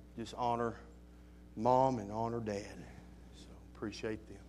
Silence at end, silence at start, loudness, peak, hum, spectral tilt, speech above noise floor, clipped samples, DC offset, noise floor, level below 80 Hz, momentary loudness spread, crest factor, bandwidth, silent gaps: 0 s; 0 s; -37 LUFS; -18 dBFS; none; -6.5 dB/octave; 20 dB; under 0.1%; under 0.1%; -56 dBFS; -58 dBFS; 25 LU; 22 dB; 14 kHz; none